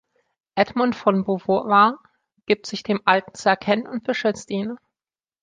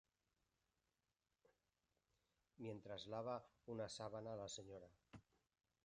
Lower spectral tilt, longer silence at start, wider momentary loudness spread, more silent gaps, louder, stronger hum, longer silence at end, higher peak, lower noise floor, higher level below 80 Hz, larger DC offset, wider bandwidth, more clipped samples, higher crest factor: about the same, -5.5 dB/octave vs -4.5 dB/octave; second, 0.55 s vs 2.6 s; second, 11 LU vs 16 LU; neither; first, -21 LUFS vs -53 LUFS; neither; about the same, 0.65 s vs 0.65 s; first, -2 dBFS vs -36 dBFS; about the same, under -90 dBFS vs under -90 dBFS; first, -64 dBFS vs -82 dBFS; neither; about the same, 9.4 kHz vs 10 kHz; neither; about the same, 20 dB vs 20 dB